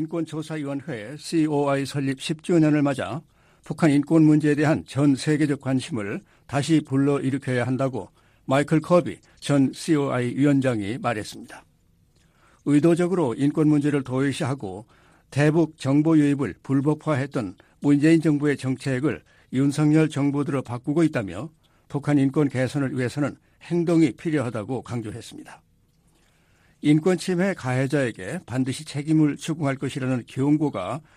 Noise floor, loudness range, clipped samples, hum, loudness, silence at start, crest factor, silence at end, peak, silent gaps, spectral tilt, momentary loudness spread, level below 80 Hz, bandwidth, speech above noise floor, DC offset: -62 dBFS; 4 LU; under 0.1%; none; -23 LUFS; 0 s; 18 dB; 0.15 s; -6 dBFS; none; -7 dB/octave; 13 LU; -60 dBFS; 12.5 kHz; 39 dB; under 0.1%